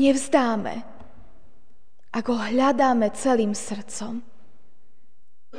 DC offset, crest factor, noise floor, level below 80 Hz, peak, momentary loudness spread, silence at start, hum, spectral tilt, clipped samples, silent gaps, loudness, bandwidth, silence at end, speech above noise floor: 2%; 20 dB; -68 dBFS; -58 dBFS; -4 dBFS; 14 LU; 0 s; none; -4.5 dB/octave; under 0.1%; none; -23 LUFS; 10 kHz; 0 s; 46 dB